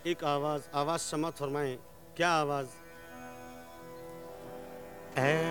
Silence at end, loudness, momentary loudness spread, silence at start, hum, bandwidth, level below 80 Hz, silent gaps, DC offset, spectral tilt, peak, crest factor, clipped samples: 0 s; -32 LUFS; 19 LU; 0 s; none; 19 kHz; -66 dBFS; none; 0.1%; -4.5 dB/octave; -12 dBFS; 22 dB; under 0.1%